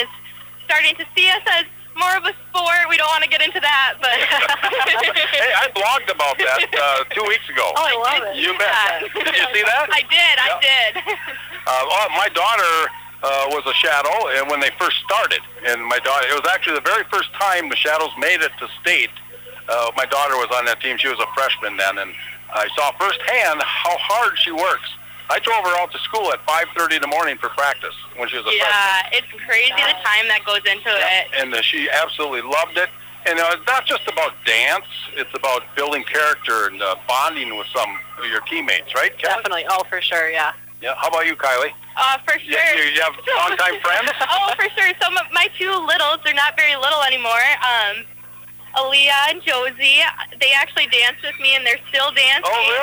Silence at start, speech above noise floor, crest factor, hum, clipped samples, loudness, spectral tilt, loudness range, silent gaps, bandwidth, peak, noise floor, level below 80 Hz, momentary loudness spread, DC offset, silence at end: 0 s; 20 dB; 16 dB; 60 Hz at -55 dBFS; under 0.1%; -17 LUFS; -0.5 dB/octave; 4 LU; none; over 20 kHz; -4 dBFS; -38 dBFS; -60 dBFS; 9 LU; under 0.1%; 0 s